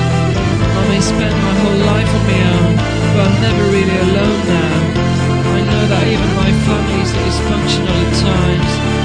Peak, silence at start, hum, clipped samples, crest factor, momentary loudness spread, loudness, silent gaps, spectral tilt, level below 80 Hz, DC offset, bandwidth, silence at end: 0 dBFS; 0 s; none; under 0.1%; 12 dB; 2 LU; -13 LUFS; none; -6 dB/octave; -24 dBFS; under 0.1%; 10 kHz; 0 s